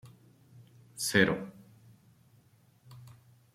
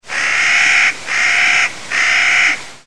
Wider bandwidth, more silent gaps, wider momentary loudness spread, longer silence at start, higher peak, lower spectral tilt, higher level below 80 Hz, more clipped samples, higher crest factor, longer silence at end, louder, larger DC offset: first, 16 kHz vs 12.5 kHz; neither; first, 27 LU vs 5 LU; about the same, 0.05 s vs 0 s; second, -8 dBFS vs 0 dBFS; first, -4 dB/octave vs 1 dB/octave; second, -68 dBFS vs -54 dBFS; neither; first, 28 dB vs 14 dB; first, 0.45 s vs 0 s; second, -29 LUFS vs -11 LUFS; second, under 0.1% vs 2%